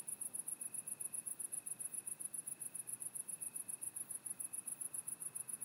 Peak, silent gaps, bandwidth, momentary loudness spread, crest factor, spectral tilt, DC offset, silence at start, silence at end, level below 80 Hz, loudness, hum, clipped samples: -28 dBFS; none; 16 kHz; 1 LU; 18 dB; -0.5 dB/octave; under 0.1%; 0 s; 0 s; under -90 dBFS; -44 LUFS; none; under 0.1%